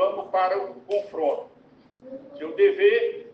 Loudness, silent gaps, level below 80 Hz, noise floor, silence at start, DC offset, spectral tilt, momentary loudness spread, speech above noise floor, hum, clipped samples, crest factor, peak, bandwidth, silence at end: -24 LUFS; none; -76 dBFS; -55 dBFS; 0 s; under 0.1%; -5.5 dB/octave; 20 LU; 33 dB; none; under 0.1%; 16 dB; -8 dBFS; 5.6 kHz; 0 s